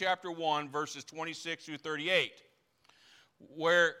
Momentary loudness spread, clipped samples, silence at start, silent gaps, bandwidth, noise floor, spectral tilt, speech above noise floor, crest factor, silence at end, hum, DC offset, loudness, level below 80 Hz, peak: 13 LU; under 0.1%; 0 s; none; 14.5 kHz; -68 dBFS; -3 dB/octave; 35 dB; 20 dB; 0 s; none; under 0.1%; -33 LUFS; -84 dBFS; -16 dBFS